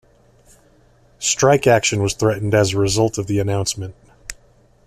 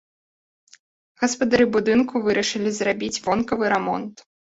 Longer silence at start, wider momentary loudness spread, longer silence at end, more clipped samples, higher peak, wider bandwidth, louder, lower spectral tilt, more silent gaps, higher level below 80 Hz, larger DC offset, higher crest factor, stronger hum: about the same, 1.2 s vs 1.2 s; first, 21 LU vs 7 LU; about the same, 0.55 s vs 0.45 s; neither; about the same, -4 dBFS vs -4 dBFS; first, 14.5 kHz vs 8 kHz; first, -18 LUFS vs -21 LUFS; about the same, -4.5 dB/octave vs -4 dB/octave; neither; first, -46 dBFS vs -56 dBFS; neither; about the same, 16 dB vs 18 dB; neither